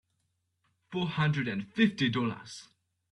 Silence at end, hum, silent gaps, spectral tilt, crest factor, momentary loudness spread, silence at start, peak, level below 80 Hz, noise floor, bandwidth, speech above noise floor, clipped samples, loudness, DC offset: 0.5 s; none; none; -6 dB/octave; 18 dB; 17 LU; 0.9 s; -14 dBFS; -68 dBFS; -78 dBFS; 11 kHz; 48 dB; under 0.1%; -30 LUFS; under 0.1%